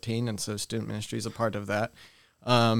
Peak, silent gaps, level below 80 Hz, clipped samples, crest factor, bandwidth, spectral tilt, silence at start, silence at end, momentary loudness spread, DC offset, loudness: -8 dBFS; none; -62 dBFS; under 0.1%; 20 dB; 16 kHz; -5 dB/octave; 0 s; 0 s; 8 LU; 0.2%; -31 LUFS